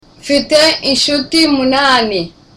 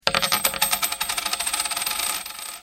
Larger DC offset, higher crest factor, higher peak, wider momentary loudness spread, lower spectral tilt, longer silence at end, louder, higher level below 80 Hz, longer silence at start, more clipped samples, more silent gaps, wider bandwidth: neither; second, 12 dB vs 24 dB; about the same, 0 dBFS vs 0 dBFS; about the same, 6 LU vs 5 LU; first, -2.5 dB/octave vs 0.5 dB/octave; first, 0.3 s vs 0 s; first, -11 LUFS vs -22 LUFS; first, -44 dBFS vs -54 dBFS; first, 0.25 s vs 0.05 s; neither; neither; second, 16 kHz vs over 20 kHz